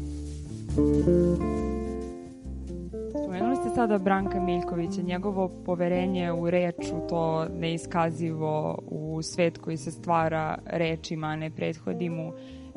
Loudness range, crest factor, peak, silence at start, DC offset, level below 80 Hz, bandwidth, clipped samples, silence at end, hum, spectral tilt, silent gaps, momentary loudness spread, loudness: 2 LU; 18 dB; -10 dBFS; 0 s; under 0.1%; -42 dBFS; 11.5 kHz; under 0.1%; 0 s; none; -7 dB/octave; none; 12 LU; -28 LUFS